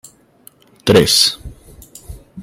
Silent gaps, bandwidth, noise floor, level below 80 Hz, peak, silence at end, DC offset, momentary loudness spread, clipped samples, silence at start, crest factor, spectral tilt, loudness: none; 16.5 kHz; -48 dBFS; -40 dBFS; 0 dBFS; 0 s; under 0.1%; 22 LU; under 0.1%; 0.85 s; 18 dB; -3.5 dB/octave; -12 LUFS